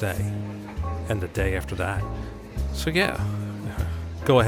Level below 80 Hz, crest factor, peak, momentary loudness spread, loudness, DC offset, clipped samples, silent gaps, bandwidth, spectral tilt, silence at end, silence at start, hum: -36 dBFS; 20 dB; -6 dBFS; 10 LU; -28 LUFS; under 0.1%; under 0.1%; none; 17.5 kHz; -6 dB/octave; 0 s; 0 s; none